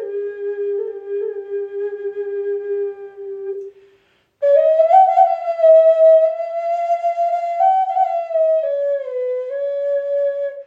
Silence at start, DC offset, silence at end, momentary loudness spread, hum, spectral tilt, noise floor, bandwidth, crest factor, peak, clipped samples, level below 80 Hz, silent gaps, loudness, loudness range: 0 s; under 0.1%; 0.05 s; 15 LU; none; -4 dB/octave; -58 dBFS; 5 kHz; 16 dB; -2 dBFS; under 0.1%; -80 dBFS; none; -17 LUFS; 11 LU